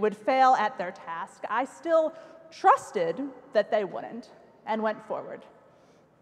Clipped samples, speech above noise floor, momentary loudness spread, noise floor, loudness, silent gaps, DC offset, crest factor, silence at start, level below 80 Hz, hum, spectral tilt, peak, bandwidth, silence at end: under 0.1%; 32 dB; 20 LU; -59 dBFS; -27 LUFS; none; under 0.1%; 20 dB; 0 s; -80 dBFS; none; -4.5 dB/octave; -8 dBFS; 11.5 kHz; 0.8 s